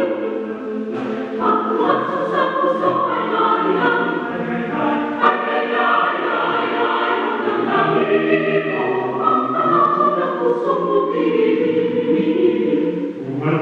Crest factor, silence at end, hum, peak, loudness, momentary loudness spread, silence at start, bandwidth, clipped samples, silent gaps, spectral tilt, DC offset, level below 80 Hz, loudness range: 16 dB; 0 s; none; -2 dBFS; -18 LUFS; 7 LU; 0 s; 7.2 kHz; under 0.1%; none; -7.5 dB/octave; under 0.1%; -64 dBFS; 1 LU